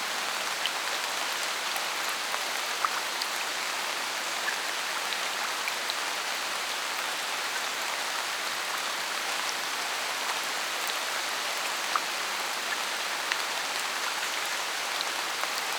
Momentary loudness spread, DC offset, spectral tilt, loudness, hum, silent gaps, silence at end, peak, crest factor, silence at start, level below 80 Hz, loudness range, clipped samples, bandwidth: 1 LU; under 0.1%; 1.5 dB/octave; -29 LUFS; none; none; 0 s; -6 dBFS; 26 dB; 0 s; under -90 dBFS; 1 LU; under 0.1%; over 20 kHz